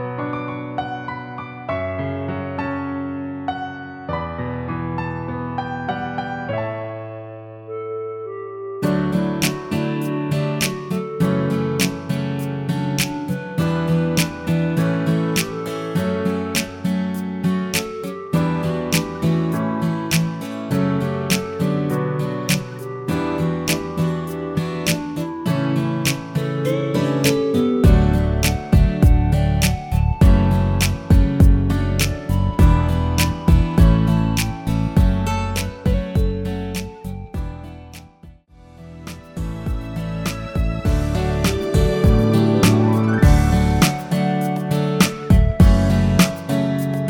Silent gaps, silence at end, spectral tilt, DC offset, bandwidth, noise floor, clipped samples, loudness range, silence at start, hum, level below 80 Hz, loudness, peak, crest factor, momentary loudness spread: none; 0 s; -6 dB/octave; under 0.1%; 18 kHz; -45 dBFS; under 0.1%; 10 LU; 0 s; none; -26 dBFS; -20 LUFS; 0 dBFS; 18 dB; 13 LU